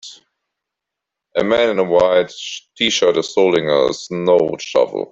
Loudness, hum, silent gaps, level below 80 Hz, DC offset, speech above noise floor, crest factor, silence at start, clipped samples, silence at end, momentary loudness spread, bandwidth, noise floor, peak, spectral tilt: -16 LUFS; none; none; -54 dBFS; under 0.1%; 66 dB; 16 dB; 0.05 s; under 0.1%; 0.05 s; 8 LU; 7.8 kHz; -82 dBFS; -2 dBFS; -4 dB/octave